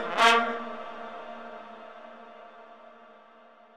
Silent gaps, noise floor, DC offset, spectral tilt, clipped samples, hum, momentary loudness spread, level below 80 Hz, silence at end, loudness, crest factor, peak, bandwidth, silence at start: none; -55 dBFS; under 0.1%; -1.5 dB/octave; under 0.1%; none; 28 LU; -80 dBFS; 0.3 s; -25 LUFS; 28 dB; -2 dBFS; 15.5 kHz; 0 s